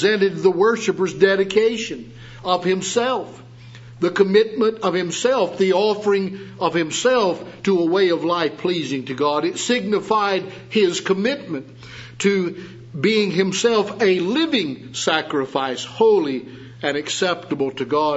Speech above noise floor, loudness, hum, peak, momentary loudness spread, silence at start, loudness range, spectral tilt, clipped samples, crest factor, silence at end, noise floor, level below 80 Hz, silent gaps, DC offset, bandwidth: 21 dB; -20 LUFS; none; -2 dBFS; 10 LU; 0 s; 2 LU; -4.5 dB/octave; under 0.1%; 18 dB; 0 s; -40 dBFS; -60 dBFS; none; under 0.1%; 8 kHz